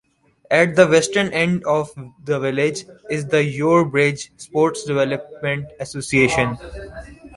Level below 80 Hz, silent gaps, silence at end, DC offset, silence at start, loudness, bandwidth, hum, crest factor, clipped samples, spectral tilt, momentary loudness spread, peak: -48 dBFS; none; 0 s; under 0.1%; 0.5 s; -19 LUFS; 11.5 kHz; none; 18 dB; under 0.1%; -5 dB/octave; 17 LU; -2 dBFS